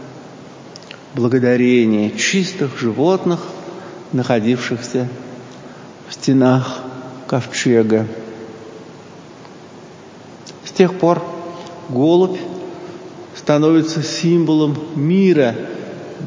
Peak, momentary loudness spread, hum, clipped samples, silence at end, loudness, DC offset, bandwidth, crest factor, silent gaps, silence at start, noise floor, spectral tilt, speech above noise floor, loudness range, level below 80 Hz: 0 dBFS; 23 LU; none; under 0.1%; 0 s; -16 LUFS; under 0.1%; 7.6 kHz; 18 dB; none; 0 s; -38 dBFS; -6 dB/octave; 23 dB; 5 LU; -62 dBFS